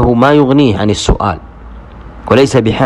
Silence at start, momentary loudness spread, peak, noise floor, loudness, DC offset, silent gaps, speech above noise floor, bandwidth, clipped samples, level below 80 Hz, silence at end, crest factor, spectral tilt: 0 s; 10 LU; 0 dBFS; -31 dBFS; -10 LUFS; under 0.1%; none; 21 dB; 11.5 kHz; 0.7%; -24 dBFS; 0 s; 10 dB; -6 dB/octave